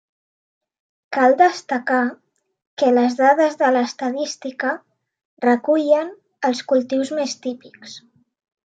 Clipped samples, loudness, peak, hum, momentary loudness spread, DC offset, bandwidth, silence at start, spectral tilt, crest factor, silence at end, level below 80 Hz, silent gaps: under 0.1%; -19 LUFS; -2 dBFS; none; 15 LU; under 0.1%; 9 kHz; 1.1 s; -3.5 dB/octave; 18 dB; 0.8 s; -80 dBFS; 2.67-2.77 s, 5.25-5.37 s